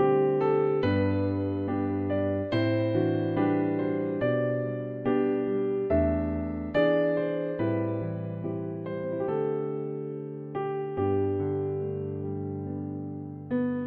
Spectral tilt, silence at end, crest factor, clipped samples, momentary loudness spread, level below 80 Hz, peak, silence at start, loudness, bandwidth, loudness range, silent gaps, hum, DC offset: -10.5 dB/octave; 0 s; 16 dB; under 0.1%; 9 LU; -50 dBFS; -12 dBFS; 0 s; -29 LUFS; 5.2 kHz; 4 LU; none; none; under 0.1%